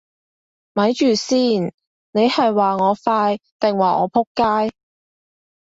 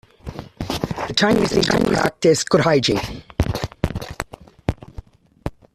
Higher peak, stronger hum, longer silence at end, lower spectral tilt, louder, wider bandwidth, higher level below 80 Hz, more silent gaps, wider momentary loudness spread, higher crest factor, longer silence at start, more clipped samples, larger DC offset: about the same, -4 dBFS vs -2 dBFS; neither; first, 1 s vs 0.25 s; about the same, -5 dB/octave vs -5 dB/octave; about the same, -18 LUFS vs -20 LUFS; second, 8 kHz vs 14.5 kHz; second, -60 dBFS vs -36 dBFS; first, 1.74-1.78 s, 1.87-2.13 s, 3.52-3.60 s, 4.27-4.35 s vs none; second, 6 LU vs 17 LU; about the same, 16 dB vs 20 dB; first, 0.75 s vs 0.25 s; neither; neither